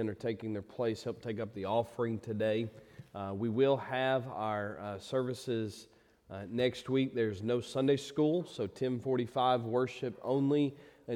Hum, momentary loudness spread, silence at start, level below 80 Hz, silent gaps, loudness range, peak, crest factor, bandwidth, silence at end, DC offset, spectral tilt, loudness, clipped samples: none; 10 LU; 0 s; -72 dBFS; none; 4 LU; -18 dBFS; 16 dB; 15 kHz; 0 s; under 0.1%; -6.5 dB/octave; -34 LUFS; under 0.1%